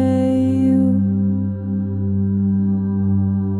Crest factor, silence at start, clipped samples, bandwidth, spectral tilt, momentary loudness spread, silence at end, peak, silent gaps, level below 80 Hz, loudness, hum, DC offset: 10 dB; 0 s; under 0.1%; 10 kHz; -10.5 dB/octave; 6 LU; 0 s; -6 dBFS; none; -54 dBFS; -18 LUFS; 50 Hz at -40 dBFS; under 0.1%